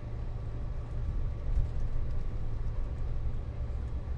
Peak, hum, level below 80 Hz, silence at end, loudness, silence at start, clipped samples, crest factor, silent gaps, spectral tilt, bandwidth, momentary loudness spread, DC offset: -16 dBFS; none; -34 dBFS; 0 s; -38 LUFS; 0 s; under 0.1%; 16 dB; none; -8.5 dB/octave; 4.4 kHz; 5 LU; under 0.1%